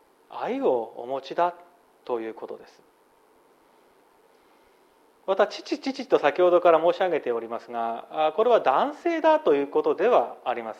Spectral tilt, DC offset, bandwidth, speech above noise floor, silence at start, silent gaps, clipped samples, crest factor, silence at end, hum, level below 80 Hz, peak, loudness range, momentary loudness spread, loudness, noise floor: -5 dB/octave; under 0.1%; 8.2 kHz; 36 dB; 0.3 s; none; under 0.1%; 20 dB; 0.05 s; none; -78 dBFS; -6 dBFS; 17 LU; 14 LU; -24 LUFS; -60 dBFS